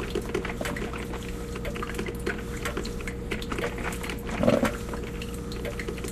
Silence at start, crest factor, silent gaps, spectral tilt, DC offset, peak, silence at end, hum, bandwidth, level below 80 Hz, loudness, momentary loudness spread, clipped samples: 0 s; 22 dB; none; -5 dB/octave; under 0.1%; -8 dBFS; 0 s; none; 14 kHz; -38 dBFS; -31 LUFS; 9 LU; under 0.1%